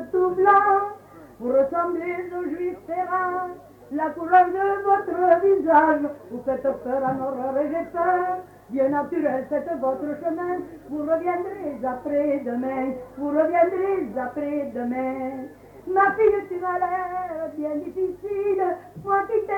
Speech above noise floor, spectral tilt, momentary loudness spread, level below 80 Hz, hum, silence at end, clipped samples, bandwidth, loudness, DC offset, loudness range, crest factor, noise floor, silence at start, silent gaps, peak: 20 dB; -8 dB/octave; 13 LU; -60 dBFS; 50 Hz at -55 dBFS; 0 s; under 0.1%; 18.5 kHz; -23 LUFS; under 0.1%; 6 LU; 18 dB; -44 dBFS; 0 s; none; -4 dBFS